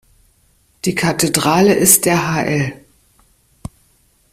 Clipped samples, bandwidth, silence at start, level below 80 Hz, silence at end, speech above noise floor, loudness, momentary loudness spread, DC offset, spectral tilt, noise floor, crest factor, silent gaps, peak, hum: under 0.1%; 16 kHz; 0.85 s; -48 dBFS; 1.6 s; 42 dB; -14 LUFS; 26 LU; under 0.1%; -3.5 dB/octave; -56 dBFS; 18 dB; none; 0 dBFS; none